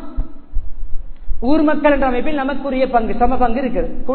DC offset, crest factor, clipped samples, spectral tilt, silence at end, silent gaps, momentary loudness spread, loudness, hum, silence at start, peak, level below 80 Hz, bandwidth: under 0.1%; 14 dB; under 0.1%; -10 dB/octave; 0 s; none; 19 LU; -17 LUFS; none; 0 s; 0 dBFS; -24 dBFS; 4.5 kHz